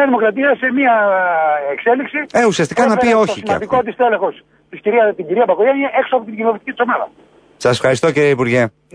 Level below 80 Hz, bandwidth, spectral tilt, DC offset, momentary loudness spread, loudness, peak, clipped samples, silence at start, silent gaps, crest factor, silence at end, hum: -54 dBFS; 10.5 kHz; -5.5 dB/octave; under 0.1%; 6 LU; -15 LUFS; -2 dBFS; under 0.1%; 0 s; none; 12 dB; 0.25 s; none